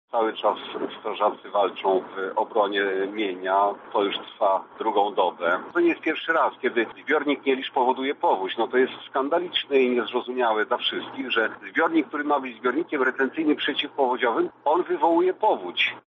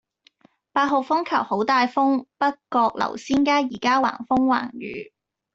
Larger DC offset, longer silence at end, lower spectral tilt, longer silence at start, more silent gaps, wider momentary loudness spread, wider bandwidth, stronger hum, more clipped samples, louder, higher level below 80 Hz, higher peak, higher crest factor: neither; second, 0.1 s vs 0.5 s; second, -0.5 dB/octave vs -4.5 dB/octave; second, 0.15 s vs 0.75 s; neither; second, 4 LU vs 8 LU; second, 6 kHz vs 7.8 kHz; neither; neither; about the same, -24 LUFS vs -22 LUFS; second, -78 dBFS vs -60 dBFS; about the same, -8 dBFS vs -8 dBFS; about the same, 16 dB vs 16 dB